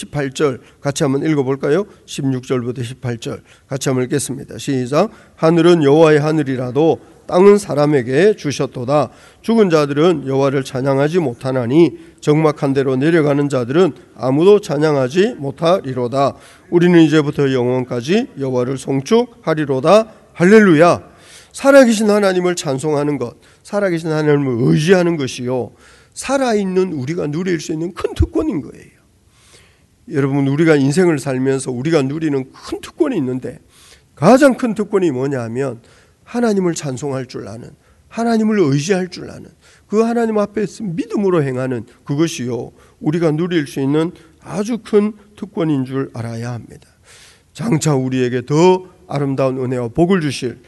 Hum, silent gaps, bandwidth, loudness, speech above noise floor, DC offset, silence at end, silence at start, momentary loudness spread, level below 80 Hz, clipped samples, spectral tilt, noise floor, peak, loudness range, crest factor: none; none; 12 kHz; -16 LUFS; 37 dB; under 0.1%; 0.1 s; 0 s; 13 LU; -44 dBFS; under 0.1%; -6.5 dB/octave; -52 dBFS; 0 dBFS; 7 LU; 16 dB